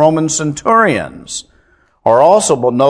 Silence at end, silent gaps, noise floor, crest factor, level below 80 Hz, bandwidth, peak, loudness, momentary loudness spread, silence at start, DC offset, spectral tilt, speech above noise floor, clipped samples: 0 s; none; -52 dBFS; 12 dB; -50 dBFS; 11 kHz; 0 dBFS; -12 LUFS; 16 LU; 0 s; under 0.1%; -4.5 dB/octave; 41 dB; 0.4%